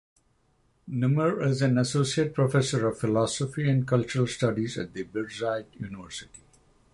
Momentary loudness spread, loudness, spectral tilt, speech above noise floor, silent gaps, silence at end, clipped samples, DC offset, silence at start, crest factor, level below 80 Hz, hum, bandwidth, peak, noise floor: 12 LU; -27 LUFS; -6 dB/octave; 41 dB; none; 0.55 s; under 0.1%; under 0.1%; 0.85 s; 16 dB; -58 dBFS; none; 11.5 kHz; -12 dBFS; -67 dBFS